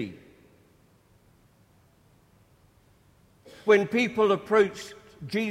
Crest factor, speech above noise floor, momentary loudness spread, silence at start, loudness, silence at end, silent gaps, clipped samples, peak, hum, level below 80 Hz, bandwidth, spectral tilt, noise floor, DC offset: 22 dB; 37 dB; 20 LU; 0 s; -24 LUFS; 0 s; none; under 0.1%; -6 dBFS; none; -66 dBFS; 13 kHz; -5.5 dB/octave; -61 dBFS; under 0.1%